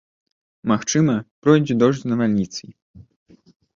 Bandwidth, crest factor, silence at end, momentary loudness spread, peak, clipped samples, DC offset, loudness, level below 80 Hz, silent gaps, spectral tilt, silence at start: 7.6 kHz; 18 dB; 1.05 s; 11 LU; -2 dBFS; under 0.1%; under 0.1%; -19 LUFS; -56 dBFS; 1.31-1.42 s; -6 dB/octave; 0.65 s